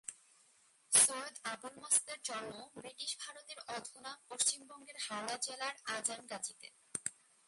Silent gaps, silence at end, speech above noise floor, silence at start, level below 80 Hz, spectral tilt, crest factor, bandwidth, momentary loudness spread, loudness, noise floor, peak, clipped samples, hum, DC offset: none; 0.35 s; 27 dB; 0.1 s; -86 dBFS; 0.5 dB/octave; 26 dB; 12 kHz; 19 LU; -36 LUFS; -69 dBFS; -14 dBFS; under 0.1%; none; under 0.1%